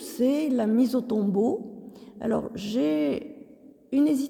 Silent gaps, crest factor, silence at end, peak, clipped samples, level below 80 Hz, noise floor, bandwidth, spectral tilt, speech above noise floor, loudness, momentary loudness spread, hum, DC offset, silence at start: none; 12 dB; 0 s; -14 dBFS; under 0.1%; -64 dBFS; -51 dBFS; 18 kHz; -6.5 dB/octave; 27 dB; -26 LUFS; 14 LU; none; under 0.1%; 0 s